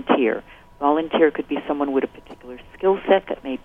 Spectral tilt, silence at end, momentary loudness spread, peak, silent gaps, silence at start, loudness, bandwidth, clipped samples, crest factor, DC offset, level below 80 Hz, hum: -7.5 dB/octave; 0.05 s; 20 LU; -2 dBFS; none; 0 s; -21 LUFS; 3.9 kHz; under 0.1%; 20 dB; under 0.1%; -52 dBFS; none